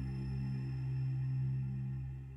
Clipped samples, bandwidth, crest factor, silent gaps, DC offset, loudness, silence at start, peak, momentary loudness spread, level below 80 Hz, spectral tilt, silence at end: under 0.1%; 5.6 kHz; 8 dB; none; under 0.1%; -39 LUFS; 0 s; -30 dBFS; 4 LU; -52 dBFS; -9.5 dB/octave; 0 s